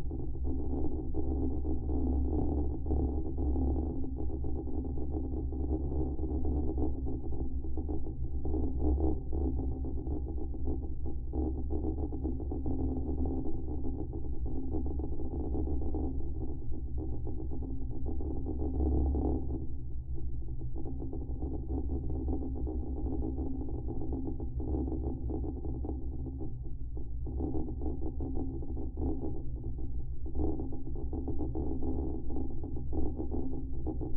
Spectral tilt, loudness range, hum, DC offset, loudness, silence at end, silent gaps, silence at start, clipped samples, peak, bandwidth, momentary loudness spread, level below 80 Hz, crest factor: -14 dB/octave; 4 LU; none; under 0.1%; -37 LUFS; 0 s; none; 0 s; under 0.1%; -18 dBFS; 1.2 kHz; 7 LU; -36 dBFS; 14 dB